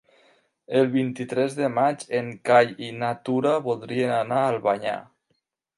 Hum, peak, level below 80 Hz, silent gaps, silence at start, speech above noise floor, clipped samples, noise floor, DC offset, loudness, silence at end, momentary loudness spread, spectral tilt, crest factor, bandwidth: none; -4 dBFS; -70 dBFS; none; 0.7 s; 51 dB; under 0.1%; -74 dBFS; under 0.1%; -24 LUFS; 0.75 s; 9 LU; -6 dB/octave; 20 dB; 11.5 kHz